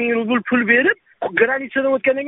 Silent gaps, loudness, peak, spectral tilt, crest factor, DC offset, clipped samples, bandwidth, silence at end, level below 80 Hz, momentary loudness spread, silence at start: none; -17 LUFS; -2 dBFS; -2.5 dB/octave; 16 dB; under 0.1%; under 0.1%; 4 kHz; 0 s; -62 dBFS; 6 LU; 0 s